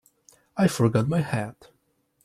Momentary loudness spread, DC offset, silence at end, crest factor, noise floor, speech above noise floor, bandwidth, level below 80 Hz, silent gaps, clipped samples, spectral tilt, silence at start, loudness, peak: 14 LU; under 0.1%; 0.75 s; 18 dB; -69 dBFS; 45 dB; 14.5 kHz; -58 dBFS; none; under 0.1%; -6.5 dB/octave; 0.55 s; -24 LUFS; -8 dBFS